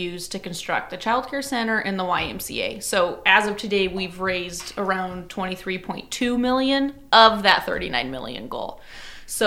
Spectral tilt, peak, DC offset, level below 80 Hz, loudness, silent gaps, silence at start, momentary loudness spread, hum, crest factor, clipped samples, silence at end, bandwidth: -3 dB/octave; 0 dBFS; under 0.1%; -48 dBFS; -22 LUFS; none; 0 s; 14 LU; none; 22 dB; under 0.1%; 0 s; 16.5 kHz